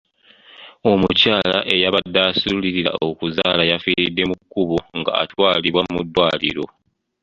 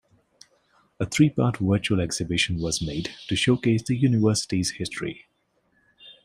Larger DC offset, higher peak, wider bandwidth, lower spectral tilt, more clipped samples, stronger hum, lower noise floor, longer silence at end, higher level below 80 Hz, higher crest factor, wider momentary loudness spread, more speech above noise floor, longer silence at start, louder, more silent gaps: neither; first, 0 dBFS vs -6 dBFS; second, 7.8 kHz vs 15.5 kHz; about the same, -6 dB/octave vs -5 dB/octave; neither; neither; second, -49 dBFS vs -69 dBFS; first, 0.55 s vs 0.1 s; about the same, -48 dBFS vs -52 dBFS; about the same, 20 dB vs 20 dB; second, 7 LU vs 11 LU; second, 31 dB vs 45 dB; second, 0.6 s vs 1 s; first, -18 LUFS vs -24 LUFS; neither